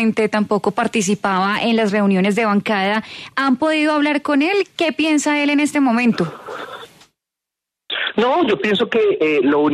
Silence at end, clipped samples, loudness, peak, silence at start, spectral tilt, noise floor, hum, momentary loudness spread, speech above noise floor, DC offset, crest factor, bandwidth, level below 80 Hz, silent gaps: 0 s; under 0.1%; -17 LUFS; -4 dBFS; 0 s; -5 dB/octave; -84 dBFS; none; 7 LU; 67 dB; under 0.1%; 14 dB; 13.5 kHz; -62 dBFS; none